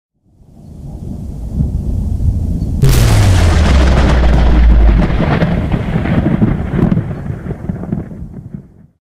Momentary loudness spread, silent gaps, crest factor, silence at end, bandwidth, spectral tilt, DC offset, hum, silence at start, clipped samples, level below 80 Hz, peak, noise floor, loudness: 18 LU; none; 12 dB; 0.25 s; 15.5 kHz; -6.5 dB/octave; under 0.1%; none; 0.5 s; under 0.1%; -16 dBFS; 0 dBFS; -44 dBFS; -13 LUFS